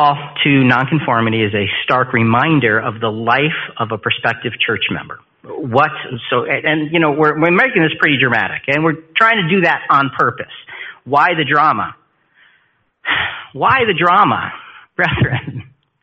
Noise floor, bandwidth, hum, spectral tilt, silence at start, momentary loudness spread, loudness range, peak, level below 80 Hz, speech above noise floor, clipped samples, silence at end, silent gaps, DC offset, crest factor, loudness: -59 dBFS; 8 kHz; none; -7.5 dB/octave; 0 s; 14 LU; 4 LU; 0 dBFS; -48 dBFS; 44 dB; under 0.1%; 0.4 s; none; under 0.1%; 16 dB; -14 LUFS